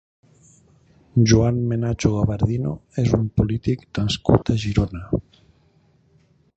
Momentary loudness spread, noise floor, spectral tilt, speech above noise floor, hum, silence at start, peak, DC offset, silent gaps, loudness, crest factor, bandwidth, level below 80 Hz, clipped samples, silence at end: 9 LU; -59 dBFS; -6.5 dB/octave; 39 dB; none; 1.15 s; -2 dBFS; under 0.1%; none; -21 LUFS; 20 dB; 8.2 kHz; -38 dBFS; under 0.1%; 1.35 s